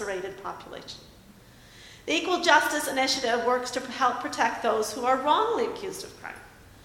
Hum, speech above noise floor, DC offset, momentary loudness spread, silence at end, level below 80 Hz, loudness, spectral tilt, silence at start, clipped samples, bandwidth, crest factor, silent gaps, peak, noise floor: none; 25 dB; under 0.1%; 20 LU; 0.05 s; -60 dBFS; -25 LUFS; -2 dB/octave; 0 s; under 0.1%; 17.5 kHz; 22 dB; none; -6 dBFS; -52 dBFS